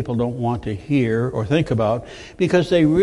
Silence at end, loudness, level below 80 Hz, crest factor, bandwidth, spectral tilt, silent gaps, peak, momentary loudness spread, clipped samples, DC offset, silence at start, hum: 0 s; -20 LUFS; -44 dBFS; 14 dB; 11.5 kHz; -7.5 dB/octave; none; -4 dBFS; 8 LU; under 0.1%; under 0.1%; 0 s; none